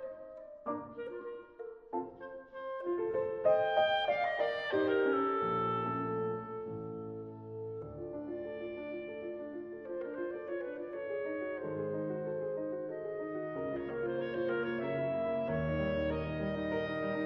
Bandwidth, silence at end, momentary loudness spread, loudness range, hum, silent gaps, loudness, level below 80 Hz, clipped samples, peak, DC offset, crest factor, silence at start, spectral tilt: 6.4 kHz; 0 s; 14 LU; 10 LU; none; none; -36 LUFS; -60 dBFS; under 0.1%; -18 dBFS; under 0.1%; 18 dB; 0 s; -8.5 dB/octave